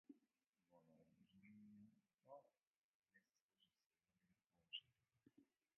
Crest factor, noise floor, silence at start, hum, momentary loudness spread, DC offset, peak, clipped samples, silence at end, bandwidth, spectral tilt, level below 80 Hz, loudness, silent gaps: 30 dB; under -90 dBFS; 0.1 s; none; 11 LU; under 0.1%; -40 dBFS; under 0.1%; 0.3 s; 3.2 kHz; -3 dB/octave; under -90 dBFS; -61 LUFS; 0.49-0.53 s, 2.14-2.18 s, 2.67-2.71 s, 2.77-3.00 s, 3.41-3.49 s, 3.86-3.90 s